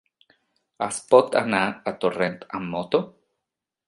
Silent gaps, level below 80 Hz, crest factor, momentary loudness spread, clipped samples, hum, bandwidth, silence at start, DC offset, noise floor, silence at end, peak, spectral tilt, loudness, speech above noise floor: none; -64 dBFS; 24 dB; 13 LU; under 0.1%; none; 11.5 kHz; 0.8 s; under 0.1%; -85 dBFS; 0.8 s; -2 dBFS; -4.5 dB/octave; -23 LUFS; 62 dB